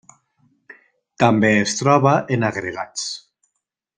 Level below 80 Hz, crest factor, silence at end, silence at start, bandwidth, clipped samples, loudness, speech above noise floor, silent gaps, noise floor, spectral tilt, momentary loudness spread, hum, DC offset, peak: -58 dBFS; 18 dB; 0.8 s; 1.2 s; 10 kHz; under 0.1%; -18 LUFS; 60 dB; none; -77 dBFS; -5 dB/octave; 12 LU; none; under 0.1%; -2 dBFS